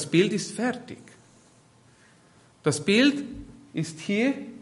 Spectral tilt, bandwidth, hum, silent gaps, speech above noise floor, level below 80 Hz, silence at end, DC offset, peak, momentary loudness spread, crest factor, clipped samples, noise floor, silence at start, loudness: -4.5 dB/octave; 11.5 kHz; none; none; 32 dB; -60 dBFS; 0 s; under 0.1%; -8 dBFS; 19 LU; 20 dB; under 0.1%; -57 dBFS; 0 s; -25 LUFS